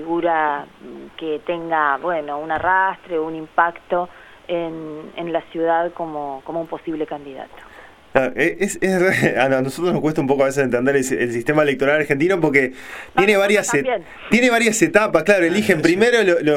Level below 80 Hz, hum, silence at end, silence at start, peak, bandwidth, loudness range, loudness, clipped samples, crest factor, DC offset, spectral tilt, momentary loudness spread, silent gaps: -52 dBFS; none; 0 s; 0 s; 0 dBFS; 16.5 kHz; 8 LU; -18 LUFS; under 0.1%; 18 dB; under 0.1%; -4.5 dB/octave; 13 LU; none